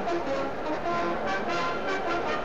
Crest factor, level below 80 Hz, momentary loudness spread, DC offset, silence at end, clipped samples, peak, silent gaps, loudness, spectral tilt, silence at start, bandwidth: 12 dB; -52 dBFS; 2 LU; 1%; 0 s; under 0.1%; -16 dBFS; none; -29 LUFS; -5 dB/octave; 0 s; 9.4 kHz